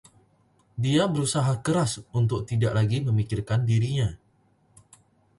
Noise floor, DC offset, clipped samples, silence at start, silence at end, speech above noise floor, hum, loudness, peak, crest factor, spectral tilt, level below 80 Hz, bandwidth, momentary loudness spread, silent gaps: -64 dBFS; under 0.1%; under 0.1%; 0.75 s; 1.25 s; 40 dB; none; -25 LUFS; -10 dBFS; 16 dB; -6 dB/octave; -50 dBFS; 11.5 kHz; 5 LU; none